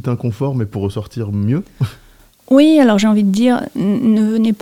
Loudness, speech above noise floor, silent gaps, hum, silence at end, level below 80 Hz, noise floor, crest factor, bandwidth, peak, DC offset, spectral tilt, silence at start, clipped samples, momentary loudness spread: -15 LUFS; 32 dB; none; none; 0.05 s; -50 dBFS; -45 dBFS; 14 dB; 15.5 kHz; 0 dBFS; under 0.1%; -7 dB/octave; 0.05 s; under 0.1%; 13 LU